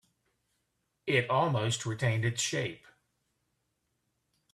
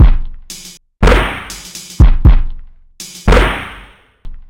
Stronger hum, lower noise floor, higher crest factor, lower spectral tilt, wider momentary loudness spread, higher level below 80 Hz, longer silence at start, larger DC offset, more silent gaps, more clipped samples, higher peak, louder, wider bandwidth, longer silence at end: neither; first, -80 dBFS vs -39 dBFS; first, 20 dB vs 12 dB; second, -4 dB/octave vs -5.5 dB/octave; second, 8 LU vs 19 LU; second, -68 dBFS vs -14 dBFS; first, 1.05 s vs 0 s; neither; neither; neither; second, -14 dBFS vs 0 dBFS; second, -30 LUFS vs -13 LUFS; second, 13.5 kHz vs 15.5 kHz; first, 1.75 s vs 0.1 s